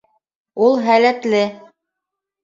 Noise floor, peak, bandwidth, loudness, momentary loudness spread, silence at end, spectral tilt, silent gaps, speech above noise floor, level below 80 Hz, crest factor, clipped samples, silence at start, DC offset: -82 dBFS; -2 dBFS; 7.6 kHz; -16 LUFS; 9 LU; 0.85 s; -5 dB/octave; none; 67 dB; -68 dBFS; 16 dB; under 0.1%; 0.55 s; under 0.1%